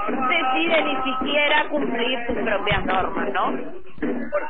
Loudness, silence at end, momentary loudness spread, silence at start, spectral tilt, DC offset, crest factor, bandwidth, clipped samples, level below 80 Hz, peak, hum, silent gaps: -22 LUFS; 0 s; 9 LU; 0 s; -8 dB/octave; 4%; 16 dB; 4.4 kHz; under 0.1%; -44 dBFS; -8 dBFS; none; none